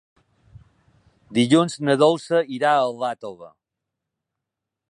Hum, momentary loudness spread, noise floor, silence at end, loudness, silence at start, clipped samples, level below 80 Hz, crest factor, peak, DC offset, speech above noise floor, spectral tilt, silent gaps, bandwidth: none; 10 LU; -84 dBFS; 1.45 s; -20 LUFS; 1.3 s; under 0.1%; -64 dBFS; 20 dB; -2 dBFS; under 0.1%; 64 dB; -5.5 dB/octave; none; 11.5 kHz